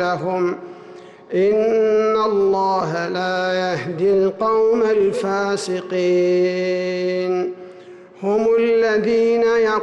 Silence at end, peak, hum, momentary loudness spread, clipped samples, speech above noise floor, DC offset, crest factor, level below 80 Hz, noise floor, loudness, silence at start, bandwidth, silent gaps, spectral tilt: 0 s; -10 dBFS; none; 7 LU; under 0.1%; 23 dB; under 0.1%; 8 dB; -60 dBFS; -41 dBFS; -18 LUFS; 0 s; 11 kHz; none; -6 dB/octave